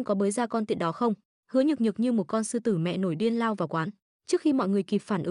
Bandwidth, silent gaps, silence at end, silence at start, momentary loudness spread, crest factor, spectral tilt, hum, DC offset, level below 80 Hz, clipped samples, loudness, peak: 11 kHz; 1.25-1.43 s, 4.02-4.20 s; 0 s; 0 s; 5 LU; 14 dB; -6 dB/octave; none; under 0.1%; -74 dBFS; under 0.1%; -27 LUFS; -14 dBFS